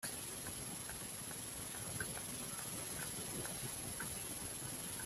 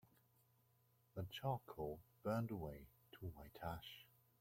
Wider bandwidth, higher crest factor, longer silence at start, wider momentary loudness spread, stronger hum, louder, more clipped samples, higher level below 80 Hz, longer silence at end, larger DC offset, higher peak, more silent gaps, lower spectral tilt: about the same, 16 kHz vs 16.5 kHz; about the same, 18 dB vs 20 dB; about the same, 0 s vs 0.05 s; second, 2 LU vs 16 LU; neither; first, -43 LUFS vs -49 LUFS; neither; about the same, -64 dBFS vs -68 dBFS; second, 0 s vs 0.35 s; neither; about the same, -28 dBFS vs -30 dBFS; neither; second, -2 dB/octave vs -7 dB/octave